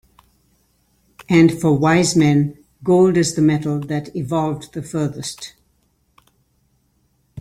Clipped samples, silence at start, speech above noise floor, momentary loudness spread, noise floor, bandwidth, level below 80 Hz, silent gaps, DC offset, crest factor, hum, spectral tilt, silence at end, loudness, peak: under 0.1%; 1.2 s; 46 dB; 14 LU; -63 dBFS; 15 kHz; -52 dBFS; none; under 0.1%; 18 dB; none; -6 dB/octave; 0 s; -17 LUFS; -2 dBFS